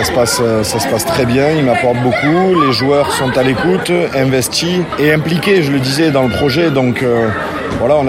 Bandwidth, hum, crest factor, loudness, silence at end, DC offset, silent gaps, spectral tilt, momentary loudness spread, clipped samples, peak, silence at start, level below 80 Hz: 16.5 kHz; none; 12 dB; -12 LUFS; 0 s; under 0.1%; none; -5 dB/octave; 3 LU; under 0.1%; 0 dBFS; 0 s; -38 dBFS